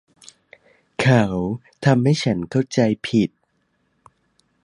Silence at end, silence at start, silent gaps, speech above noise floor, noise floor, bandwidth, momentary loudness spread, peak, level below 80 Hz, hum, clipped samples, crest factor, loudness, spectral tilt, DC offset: 1.35 s; 1 s; none; 49 dB; -68 dBFS; 11 kHz; 9 LU; -2 dBFS; -52 dBFS; none; under 0.1%; 20 dB; -20 LUFS; -6.5 dB/octave; under 0.1%